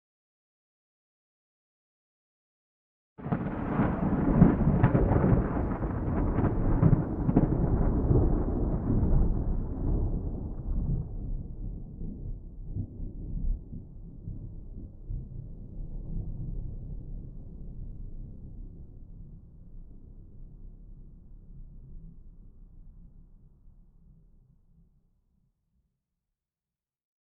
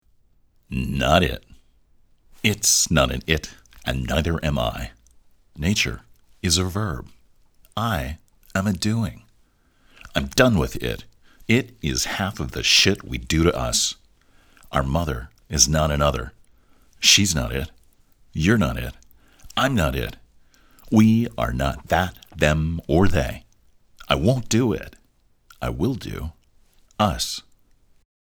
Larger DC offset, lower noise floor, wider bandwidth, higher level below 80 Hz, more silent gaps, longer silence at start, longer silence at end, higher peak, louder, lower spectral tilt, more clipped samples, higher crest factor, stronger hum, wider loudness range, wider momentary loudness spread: neither; first, under -90 dBFS vs -60 dBFS; second, 3.1 kHz vs over 20 kHz; about the same, -36 dBFS vs -36 dBFS; neither; first, 3.2 s vs 0.7 s; first, 3.55 s vs 0.9 s; second, -6 dBFS vs 0 dBFS; second, -29 LUFS vs -21 LUFS; first, -13 dB/octave vs -4 dB/octave; neither; about the same, 24 dB vs 24 dB; neither; first, 22 LU vs 5 LU; first, 22 LU vs 16 LU